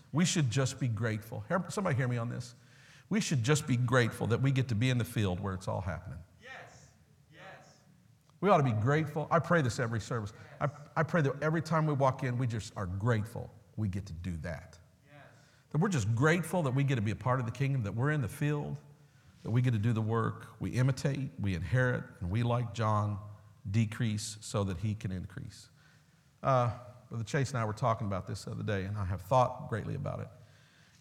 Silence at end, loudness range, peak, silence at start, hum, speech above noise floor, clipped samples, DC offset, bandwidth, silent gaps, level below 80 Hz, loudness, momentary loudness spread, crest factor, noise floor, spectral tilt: 0.55 s; 5 LU; -12 dBFS; 0.15 s; none; 32 dB; under 0.1%; under 0.1%; 14.5 kHz; none; -60 dBFS; -32 LUFS; 14 LU; 22 dB; -64 dBFS; -6 dB/octave